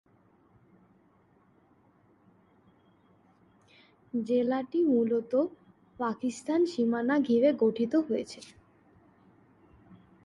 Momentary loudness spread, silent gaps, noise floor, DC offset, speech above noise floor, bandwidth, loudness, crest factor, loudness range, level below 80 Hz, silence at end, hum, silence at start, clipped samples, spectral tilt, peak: 10 LU; none; -65 dBFS; under 0.1%; 37 dB; 11 kHz; -28 LUFS; 18 dB; 7 LU; -74 dBFS; 0.3 s; none; 4.15 s; under 0.1%; -6 dB/octave; -14 dBFS